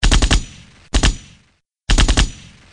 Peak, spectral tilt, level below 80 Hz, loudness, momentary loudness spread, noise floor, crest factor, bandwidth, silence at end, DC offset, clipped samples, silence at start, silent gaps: 0 dBFS; -3.5 dB/octave; -18 dBFS; -18 LUFS; 18 LU; -59 dBFS; 16 dB; 10.5 kHz; 0.4 s; under 0.1%; under 0.1%; 0 s; none